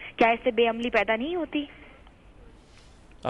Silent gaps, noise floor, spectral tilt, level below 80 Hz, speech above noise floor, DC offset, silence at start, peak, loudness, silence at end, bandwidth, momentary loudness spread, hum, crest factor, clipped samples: none; -52 dBFS; -5.5 dB/octave; -54 dBFS; 27 dB; under 0.1%; 0 s; -8 dBFS; -25 LUFS; 0 s; 9.2 kHz; 10 LU; none; 20 dB; under 0.1%